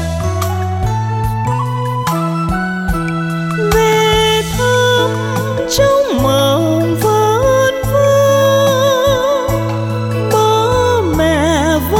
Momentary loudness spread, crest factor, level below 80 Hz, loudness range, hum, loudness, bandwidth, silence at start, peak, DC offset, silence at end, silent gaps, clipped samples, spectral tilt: 7 LU; 12 dB; -30 dBFS; 4 LU; none; -13 LUFS; 17.5 kHz; 0 s; 0 dBFS; under 0.1%; 0 s; none; under 0.1%; -5 dB/octave